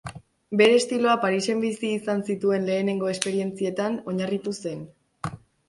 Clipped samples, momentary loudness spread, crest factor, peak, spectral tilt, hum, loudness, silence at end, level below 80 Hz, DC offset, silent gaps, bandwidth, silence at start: under 0.1%; 17 LU; 22 dB; -2 dBFS; -5 dB/octave; none; -24 LUFS; 0.3 s; -62 dBFS; under 0.1%; none; 11.5 kHz; 0.05 s